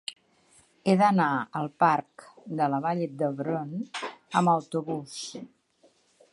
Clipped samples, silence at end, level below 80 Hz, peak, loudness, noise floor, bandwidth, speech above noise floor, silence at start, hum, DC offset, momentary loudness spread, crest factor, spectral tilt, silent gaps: under 0.1%; 0.85 s; -76 dBFS; -8 dBFS; -27 LUFS; -64 dBFS; 11.5 kHz; 38 dB; 0.1 s; none; under 0.1%; 15 LU; 20 dB; -6 dB/octave; none